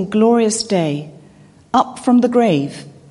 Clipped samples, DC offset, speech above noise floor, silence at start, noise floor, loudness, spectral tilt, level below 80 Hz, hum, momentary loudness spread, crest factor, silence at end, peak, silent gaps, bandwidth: under 0.1%; under 0.1%; 30 dB; 0 s; -45 dBFS; -16 LUFS; -5.5 dB/octave; -56 dBFS; none; 12 LU; 14 dB; 0.2 s; -2 dBFS; none; 11.5 kHz